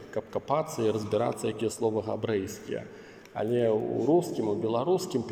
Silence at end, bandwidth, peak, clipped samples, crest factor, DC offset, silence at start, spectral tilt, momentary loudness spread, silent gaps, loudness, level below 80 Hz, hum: 0 s; 16.5 kHz; -12 dBFS; under 0.1%; 16 dB; under 0.1%; 0 s; -6 dB/octave; 11 LU; none; -29 LUFS; -68 dBFS; none